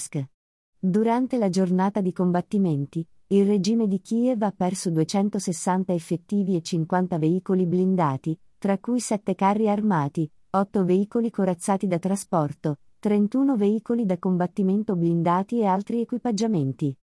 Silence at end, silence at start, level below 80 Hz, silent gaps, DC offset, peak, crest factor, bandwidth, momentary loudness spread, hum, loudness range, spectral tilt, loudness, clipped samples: 0.2 s; 0 s; -68 dBFS; 0.34-0.73 s; under 0.1%; -8 dBFS; 16 dB; 12 kHz; 6 LU; none; 1 LU; -7 dB/octave; -24 LUFS; under 0.1%